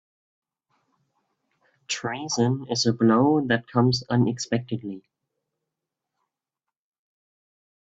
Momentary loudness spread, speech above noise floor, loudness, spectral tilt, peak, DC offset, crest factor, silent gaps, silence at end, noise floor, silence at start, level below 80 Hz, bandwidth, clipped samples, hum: 13 LU; 65 dB; -23 LUFS; -5 dB/octave; -8 dBFS; under 0.1%; 20 dB; none; 2.8 s; -88 dBFS; 1.9 s; -64 dBFS; 8 kHz; under 0.1%; none